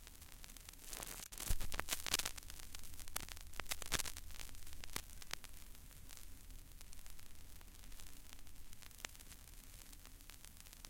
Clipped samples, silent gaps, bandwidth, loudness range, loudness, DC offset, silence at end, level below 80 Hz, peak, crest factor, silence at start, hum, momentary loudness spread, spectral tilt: under 0.1%; none; 17 kHz; 13 LU; -48 LUFS; under 0.1%; 0 s; -52 dBFS; -14 dBFS; 32 dB; 0 s; none; 17 LU; -1.5 dB/octave